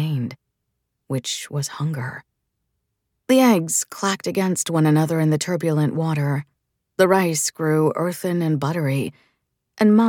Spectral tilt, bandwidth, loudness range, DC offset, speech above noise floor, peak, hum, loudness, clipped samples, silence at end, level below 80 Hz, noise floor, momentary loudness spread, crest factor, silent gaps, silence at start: -5.5 dB/octave; 18 kHz; 4 LU; under 0.1%; 57 dB; -4 dBFS; none; -21 LUFS; under 0.1%; 0 s; -68 dBFS; -76 dBFS; 12 LU; 18 dB; none; 0 s